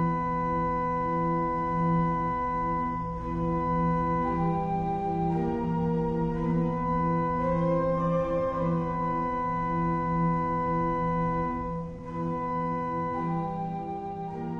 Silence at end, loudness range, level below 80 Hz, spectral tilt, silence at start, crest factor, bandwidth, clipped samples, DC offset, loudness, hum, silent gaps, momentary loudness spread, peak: 0 s; 2 LU; -44 dBFS; -10 dB/octave; 0 s; 12 dB; 5.8 kHz; under 0.1%; under 0.1%; -28 LUFS; none; none; 6 LU; -16 dBFS